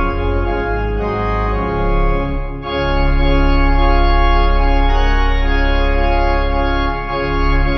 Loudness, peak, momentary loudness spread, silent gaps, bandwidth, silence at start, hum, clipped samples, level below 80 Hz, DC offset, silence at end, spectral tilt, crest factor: -17 LUFS; -2 dBFS; 5 LU; none; 6 kHz; 0 s; none; under 0.1%; -16 dBFS; under 0.1%; 0 s; -8 dB/octave; 12 dB